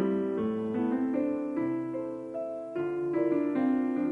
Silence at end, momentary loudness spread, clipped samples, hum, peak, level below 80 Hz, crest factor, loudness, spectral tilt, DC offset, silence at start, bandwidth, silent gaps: 0 s; 8 LU; under 0.1%; none; -16 dBFS; -70 dBFS; 14 dB; -31 LUFS; -9 dB/octave; under 0.1%; 0 s; 4.3 kHz; none